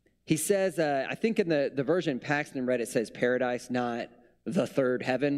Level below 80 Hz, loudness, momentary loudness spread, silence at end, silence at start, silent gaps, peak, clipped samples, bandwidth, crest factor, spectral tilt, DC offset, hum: -70 dBFS; -29 LUFS; 5 LU; 0 s; 0.3 s; none; -12 dBFS; under 0.1%; 15.5 kHz; 18 dB; -5 dB/octave; under 0.1%; none